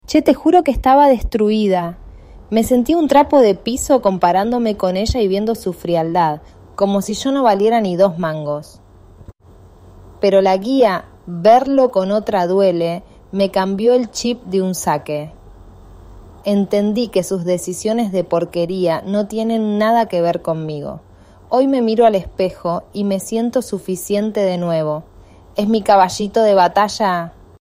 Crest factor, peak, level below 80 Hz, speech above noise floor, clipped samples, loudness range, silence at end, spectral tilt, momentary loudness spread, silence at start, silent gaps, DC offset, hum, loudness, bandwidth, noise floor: 16 dB; -2 dBFS; -38 dBFS; 29 dB; under 0.1%; 5 LU; 0.3 s; -5.5 dB/octave; 11 LU; 0.1 s; none; under 0.1%; none; -16 LUFS; 16 kHz; -44 dBFS